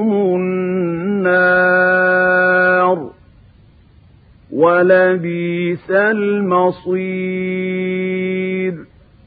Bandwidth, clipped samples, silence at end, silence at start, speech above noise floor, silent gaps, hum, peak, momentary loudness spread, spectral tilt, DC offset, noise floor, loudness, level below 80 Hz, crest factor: 4.9 kHz; under 0.1%; 0.4 s; 0 s; 31 dB; none; none; 0 dBFS; 9 LU; -12 dB/octave; under 0.1%; -47 dBFS; -15 LUFS; -54 dBFS; 16 dB